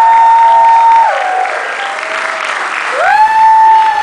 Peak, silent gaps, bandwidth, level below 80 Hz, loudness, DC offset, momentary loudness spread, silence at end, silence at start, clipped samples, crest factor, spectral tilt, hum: 0 dBFS; none; 10.5 kHz; -58 dBFS; -8 LUFS; under 0.1%; 10 LU; 0 s; 0 s; under 0.1%; 8 dB; -0.5 dB/octave; none